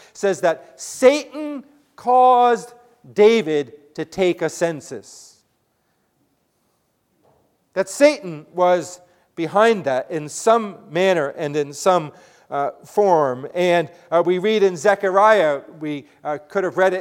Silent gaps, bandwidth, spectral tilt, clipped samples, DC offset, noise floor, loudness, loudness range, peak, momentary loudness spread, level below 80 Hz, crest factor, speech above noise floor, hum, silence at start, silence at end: none; 16.5 kHz; -4.5 dB/octave; under 0.1%; under 0.1%; -67 dBFS; -19 LUFS; 8 LU; 0 dBFS; 15 LU; -68 dBFS; 20 dB; 49 dB; none; 0.2 s; 0 s